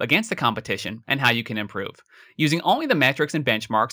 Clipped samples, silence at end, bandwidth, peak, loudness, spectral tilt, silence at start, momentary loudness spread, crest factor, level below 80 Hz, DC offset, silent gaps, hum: under 0.1%; 0 s; over 20 kHz; -4 dBFS; -22 LUFS; -4.5 dB/octave; 0 s; 9 LU; 20 dB; -64 dBFS; under 0.1%; none; none